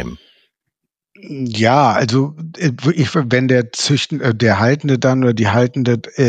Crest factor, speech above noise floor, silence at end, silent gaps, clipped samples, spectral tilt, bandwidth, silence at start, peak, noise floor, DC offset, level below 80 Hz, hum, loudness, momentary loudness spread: 14 dB; 62 dB; 0 s; none; under 0.1%; -6 dB/octave; 9.2 kHz; 0 s; 0 dBFS; -77 dBFS; under 0.1%; -52 dBFS; none; -15 LUFS; 8 LU